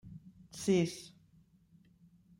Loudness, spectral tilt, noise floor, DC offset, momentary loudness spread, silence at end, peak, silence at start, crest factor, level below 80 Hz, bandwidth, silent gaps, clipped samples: -33 LUFS; -5.5 dB/octave; -66 dBFS; under 0.1%; 24 LU; 1.3 s; -18 dBFS; 0.05 s; 20 dB; -70 dBFS; 16 kHz; none; under 0.1%